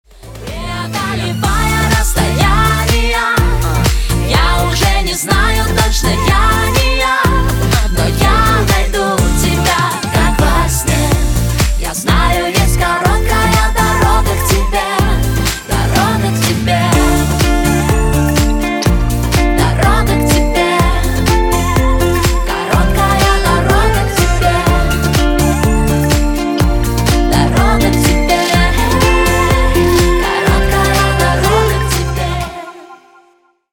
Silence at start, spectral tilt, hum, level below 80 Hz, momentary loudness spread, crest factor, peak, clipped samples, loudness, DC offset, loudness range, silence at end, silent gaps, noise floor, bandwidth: 0.25 s; -4.5 dB/octave; none; -16 dBFS; 4 LU; 12 dB; 0 dBFS; under 0.1%; -12 LUFS; under 0.1%; 2 LU; 0.75 s; none; -52 dBFS; 19 kHz